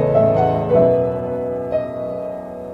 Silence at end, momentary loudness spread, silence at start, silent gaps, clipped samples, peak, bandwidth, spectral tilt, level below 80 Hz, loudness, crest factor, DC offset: 0 s; 12 LU; 0 s; none; under 0.1%; -2 dBFS; 5.6 kHz; -10 dB/octave; -44 dBFS; -18 LUFS; 14 dB; under 0.1%